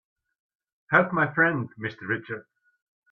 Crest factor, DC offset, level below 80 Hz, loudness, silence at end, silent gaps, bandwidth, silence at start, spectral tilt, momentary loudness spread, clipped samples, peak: 22 dB; under 0.1%; -66 dBFS; -25 LUFS; 0.7 s; none; 6.2 kHz; 0.9 s; -8.5 dB/octave; 14 LU; under 0.1%; -6 dBFS